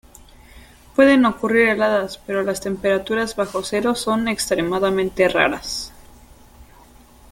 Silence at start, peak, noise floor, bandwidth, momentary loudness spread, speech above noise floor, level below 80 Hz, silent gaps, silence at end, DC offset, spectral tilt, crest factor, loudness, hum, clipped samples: 0.55 s; -2 dBFS; -47 dBFS; 17 kHz; 10 LU; 29 dB; -48 dBFS; none; 0.7 s; under 0.1%; -4 dB/octave; 18 dB; -19 LUFS; none; under 0.1%